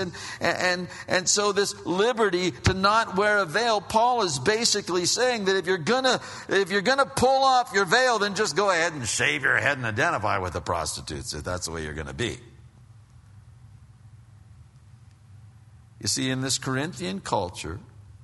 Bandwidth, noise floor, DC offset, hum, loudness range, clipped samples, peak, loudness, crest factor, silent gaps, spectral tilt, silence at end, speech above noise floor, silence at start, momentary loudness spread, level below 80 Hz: 11.5 kHz; -51 dBFS; under 0.1%; none; 13 LU; under 0.1%; -4 dBFS; -24 LUFS; 20 dB; none; -3 dB/octave; 0.05 s; 26 dB; 0 s; 10 LU; -50 dBFS